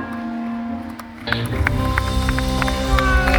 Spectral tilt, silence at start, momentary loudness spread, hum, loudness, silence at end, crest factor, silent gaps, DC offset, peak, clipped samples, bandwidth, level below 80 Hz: -5.5 dB/octave; 0 s; 11 LU; none; -21 LUFS; 0 s; 20 dB; none; under 0.1%; 0 dBFS; under 0.1%; 18.5 kHz; -24 dBFS